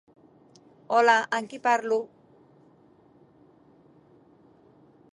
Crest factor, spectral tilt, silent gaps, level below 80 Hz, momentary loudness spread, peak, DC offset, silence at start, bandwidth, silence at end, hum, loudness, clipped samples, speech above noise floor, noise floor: 22 dB; -3 dB/octave; none; -80 dBFS; 10 LU; -8 dBFS; under 0.1%; 0.9 s; 11 kHz; 3.1 s; none; -24 LUFS; under 0.1%; 35 dB; -58 dBFS